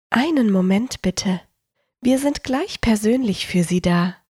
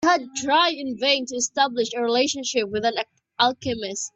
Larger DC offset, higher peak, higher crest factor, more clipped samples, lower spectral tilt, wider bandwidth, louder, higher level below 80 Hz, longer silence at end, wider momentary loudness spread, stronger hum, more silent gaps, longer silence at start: neither; about the same, -4 dBFS vs -4 dBFS; about the same, 16 dB vs 18 dB; neither; first, -5.5 dB/octave vs -2 dB/octave; first, 15.5 kHz vs 8.4 kHz; about the same, -20 LUFS vs -22 LUFS; first, -42 dBFS vs -62 dBFS; about the same, 0.15 s vs 0.1 s; about the same, 6 LU vs 8 LU; neither; neither; about the same, 0.1 s vs 0 s